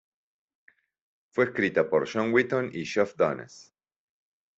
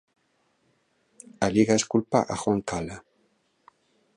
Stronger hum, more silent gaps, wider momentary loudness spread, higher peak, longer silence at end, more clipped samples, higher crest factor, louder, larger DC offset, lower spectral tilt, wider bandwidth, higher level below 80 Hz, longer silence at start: neither; neither; second, 8 LU vs 13 LU; about the same, -8 dBFS vs -6 dBFS; second, 0.95 s vs 1.15 s; neither; about the same, 22 dB vs 22 dB; about the same, -26 LUFS vs -25 LUFS; neither; about the same, -6 dB/octave vs -5 dB/octave; second, 8 kHz vs 11 kHz; second, -68 dBFS vs -56 dBFS; about the same, 1.35 s vs 1.4 s